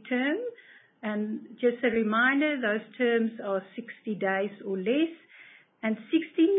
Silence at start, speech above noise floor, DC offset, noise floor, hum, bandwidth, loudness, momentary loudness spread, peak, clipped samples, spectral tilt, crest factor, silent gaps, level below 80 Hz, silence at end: 0.05 s; 26 dB; under 0.1%; -54 dBFS; none; 3.9 kHz; -28 LUFS; 12 LU; -12 dBFS; under 0.1%; -9.5 dB/octave; 16 dB; none; -76 dBFS; 0 s